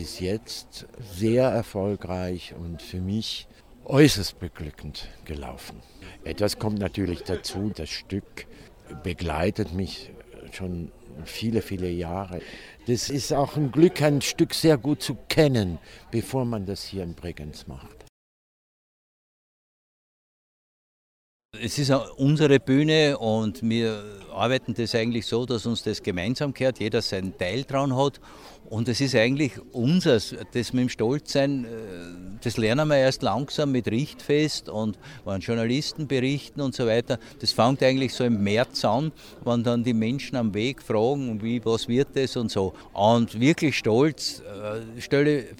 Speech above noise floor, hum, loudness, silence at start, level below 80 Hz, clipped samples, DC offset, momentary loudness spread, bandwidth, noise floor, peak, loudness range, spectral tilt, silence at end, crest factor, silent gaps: over 65 dB; none; -25 LUFS; 0 s; -50 dBFS; under 0.1%; under 0.1%; 16 LU; 16.5 kHz; under -90 dBFS; -4 dBFS; 8 LU; -5.5 dB/octave; 0.05 s; 20 dB; 18.09-21.49 s